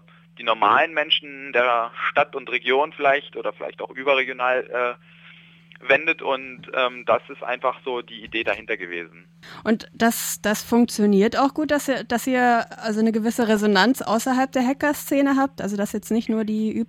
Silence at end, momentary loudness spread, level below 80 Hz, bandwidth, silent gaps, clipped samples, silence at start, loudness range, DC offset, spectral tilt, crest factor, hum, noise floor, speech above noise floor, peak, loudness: 0 s; 10 LU; -60 dBFS; 17 kHz; none; under 0.1%; 0.4 s; 5 LU; under 0.1%; -4 dB/octave; 18 dB; none; -49 dBFS; 27 dB; -4 dBFS; -22 LUFS